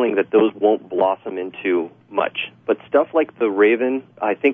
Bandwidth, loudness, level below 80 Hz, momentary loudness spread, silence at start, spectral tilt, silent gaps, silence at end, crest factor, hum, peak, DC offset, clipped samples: 3.7 kHz; -20 LUFS; -72 dBFS; 9 LU; 0 s; -8 dB/octave; none; 0 s; 16 dB; none; -4 dBFS; under 0.1%; under 0.1%